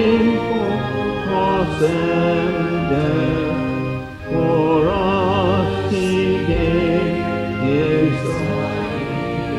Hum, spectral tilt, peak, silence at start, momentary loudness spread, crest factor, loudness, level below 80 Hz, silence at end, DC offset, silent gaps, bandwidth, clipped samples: none; -7.5 dB/octave; -4 dBFS; 0 s; 6 LU; 14 dB; -19 LUFS; -36 dBFS; 0 s; under 0.1%; none; 12.5 kHz; under 0.1%